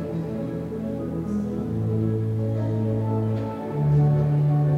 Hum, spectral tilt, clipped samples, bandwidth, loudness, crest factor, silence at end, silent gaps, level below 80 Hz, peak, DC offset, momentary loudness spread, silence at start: none; -10.5 dB/octave; under 0.1%; 4.8 kHz; -25 LUFS; 12 dB; 0 s; none; -48 dBFS; -12 dBFS; under 0.1%; 9 LU; 0 s